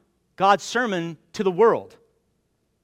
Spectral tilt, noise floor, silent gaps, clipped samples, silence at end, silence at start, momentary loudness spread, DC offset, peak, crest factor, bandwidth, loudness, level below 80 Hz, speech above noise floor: -4.5 dB/octave; -70 dBFS; none; under 0.1%; 1 s; 0.4 s; 10 LU; under 0.1%; -4 dBFS; 20 dB; 12.5 kHz; -22 LUFS; -68 dBFS; 49 dB